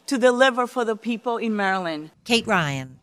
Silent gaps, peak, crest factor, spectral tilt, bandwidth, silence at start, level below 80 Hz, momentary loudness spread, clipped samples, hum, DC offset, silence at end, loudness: none; -2 dBFS; 20 dB; -4.5 dB/octave; 15 kHz; 0.1 s; -62 dBFS; 9 LU; under 0.1%; none; under 0.1%; 0.05 s; -22 LUFS